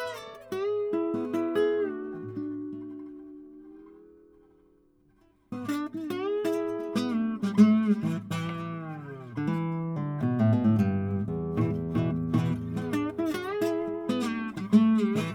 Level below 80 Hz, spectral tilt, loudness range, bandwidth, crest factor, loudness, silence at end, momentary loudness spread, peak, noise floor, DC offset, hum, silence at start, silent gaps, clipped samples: -62 dBFS; -8 dB/octave; 13 LU; 15 kHz; 20 dB; -28 LUFS; 0 s; 15 LU; -8 dBFS; -63 dBFS; under 0.1%; none; 0 s; none; under 0.1%